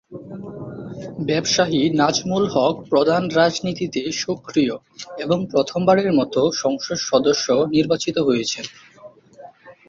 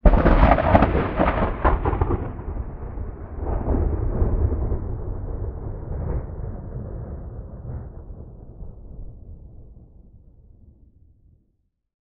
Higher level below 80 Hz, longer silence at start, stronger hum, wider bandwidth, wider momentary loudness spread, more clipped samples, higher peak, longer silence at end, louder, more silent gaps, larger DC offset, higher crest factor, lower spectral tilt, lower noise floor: second, -56 dBFS vs -26 dBFS; about the same, 0.1 s vs 0.05 s; neither; first, 7.8 kHz vs 4.9 kHz; second, 16 LU vs 25 LU; neither; about the same, -2 dBFS vs 0 dBFS; second, 0.15 s vs 1.3 s; first, -19 LUFS vs -24 LUFS; neither; neither; about the same, 18 dB vs 22 dB; second, -4.5 dB/octave vs -10.5 dB/octave; second, -45 dBFS vs -70 dBFS